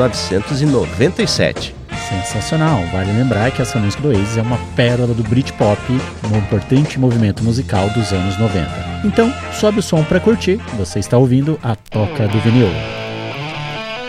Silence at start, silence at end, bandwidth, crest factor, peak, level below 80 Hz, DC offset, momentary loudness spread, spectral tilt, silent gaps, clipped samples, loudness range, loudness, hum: 0 s; 0 s; 13.5 kHz; 14 dB; 0 dBFS; -36 dBFS; under 0.1%; 9 LU; -6 dB/octave; none; under 0.1%; 1 LU; -16 LUFS; none